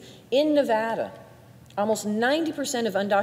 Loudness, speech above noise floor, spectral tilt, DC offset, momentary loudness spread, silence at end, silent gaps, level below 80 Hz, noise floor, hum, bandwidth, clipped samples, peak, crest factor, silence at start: -25 LUFS; 25 dB; -4 dB/octave; under 0.1%; 8 LU; 0 s; none; -68 dBFS; -49 dBFS; none; 16 kHz; under 0.1%; -10 dBFS; 14 dB; 0 s